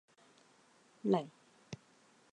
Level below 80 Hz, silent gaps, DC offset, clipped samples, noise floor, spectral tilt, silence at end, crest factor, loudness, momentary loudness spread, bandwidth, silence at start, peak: -82 dBFS; none; under 0.1%; under 0.1%; -67 dBFS; -7.5 dB/octave; 0.6 s; 24 dB; -36 LUFS; 18 LU; 10 kHz; 1.05 s; -18 dBFS